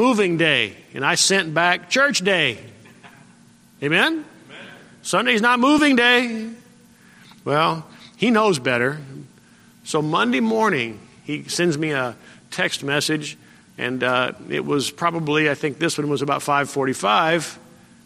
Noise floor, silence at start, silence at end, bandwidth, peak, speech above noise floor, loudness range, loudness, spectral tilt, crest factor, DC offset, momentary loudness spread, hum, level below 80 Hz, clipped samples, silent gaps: -51 dBFS; 0 s; 0.45 s; 15 kHz; -2 dBFS; 31 dB; 4 LU; -19 LUFS; -3.5 dB/octave; 20 dB; under 0.1%; 15 LU; none; -64 dBFS; under 0.1%; none